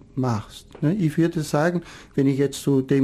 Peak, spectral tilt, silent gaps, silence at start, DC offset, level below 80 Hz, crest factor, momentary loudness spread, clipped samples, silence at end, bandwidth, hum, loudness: -8 dBFS; -7 dB/octave; none; 0.15 s; under 0.1%; -52 dBFS; 14 dB; 9 LU; under 0.1%; 0 s; 15 kHz; none; -23 LUFS